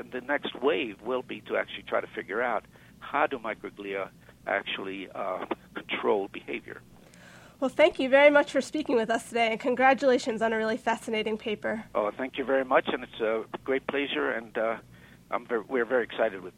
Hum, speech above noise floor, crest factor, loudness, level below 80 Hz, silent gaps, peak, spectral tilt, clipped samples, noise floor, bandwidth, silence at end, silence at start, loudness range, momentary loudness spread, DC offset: none; 24 dB; 22 dB; -28 LUFS; -64 dBFS; none; -6 dBFS; -4 dB/octave; under 0.1%; -52 dBFS; 13.5 kHz; 0.05 s; 0 s; 9 LU; 12 LU; under 0.1%